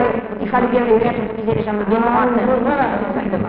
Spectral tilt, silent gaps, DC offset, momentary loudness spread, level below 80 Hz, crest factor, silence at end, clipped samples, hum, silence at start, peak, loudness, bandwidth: -6 dB/octave; none; under 0.1%; 6 LU; -40 dBFS; 14 dB; 0 s; under 0.1%; none; 0 s; -2 dBFS; -17 LUFS; 4.9 kHz